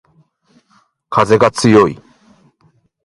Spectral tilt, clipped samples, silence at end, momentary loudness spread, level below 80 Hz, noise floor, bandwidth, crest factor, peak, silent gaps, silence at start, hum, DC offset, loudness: -5.5 dB/octave; under 0.1%; 1.1 s; 9 LU; -48 dBFS; -56 dBFS; 11.5 kHz; 16 dB; 0 dBFS; none; 1.1 s; none; under 0.1%; -12 LUFS